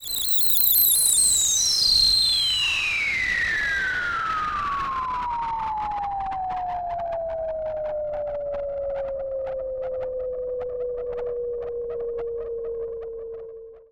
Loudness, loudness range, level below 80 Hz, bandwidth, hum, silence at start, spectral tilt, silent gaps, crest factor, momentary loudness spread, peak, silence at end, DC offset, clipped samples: -22 LUFS; 13 LU; -46 dBFS; over 20 kHz; none; 0 s; 0.5 dB/octave; none; 16 dB; 15 LU; -8 dBFS; 0.1 s; under 0.1%; under 0.1%